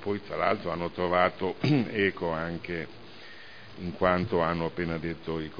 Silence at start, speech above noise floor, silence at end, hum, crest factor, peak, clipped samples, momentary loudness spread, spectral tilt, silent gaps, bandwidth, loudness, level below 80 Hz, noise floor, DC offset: 0 s; 19 dB; 0 s; none; 22 dB; -8 dBFS; under 0.1%; 20 LU; -8 dB/octave; none; 5.2 kHz; -29 LUFS; -54 dBFS; -48 dBFS; 0.4%